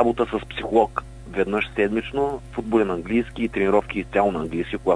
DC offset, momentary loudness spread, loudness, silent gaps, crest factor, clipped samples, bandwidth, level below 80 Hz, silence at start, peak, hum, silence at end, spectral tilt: under 0.1%; 6 LU; -23 LUFS; none; 20 dB; under 0.1%; 10.5 kHz; -42 dBFS; 0 s; -2 dBFS; none; 0 s; -7 dB/octave